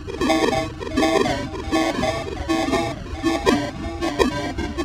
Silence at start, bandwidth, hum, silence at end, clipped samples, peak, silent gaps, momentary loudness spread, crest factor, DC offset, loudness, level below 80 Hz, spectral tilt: 0 s; 16.5 kHz; none; 0 s; under 0.1%; 0 dBFS; none; 8 LU; 22 dB; under 0.1%; -22 LUFS; -36 dBFS; -5 dB/octave